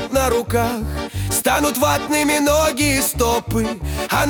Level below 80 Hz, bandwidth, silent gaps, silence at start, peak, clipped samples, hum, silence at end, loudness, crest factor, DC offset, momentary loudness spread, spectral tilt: -32 dBFS; 19 kHz; none; 0 s; -4 dBFS; under 0.1%; none; 0 s; -18 LUFS; 16 dB; under 0.1%; 8 LU; -4 dB/octave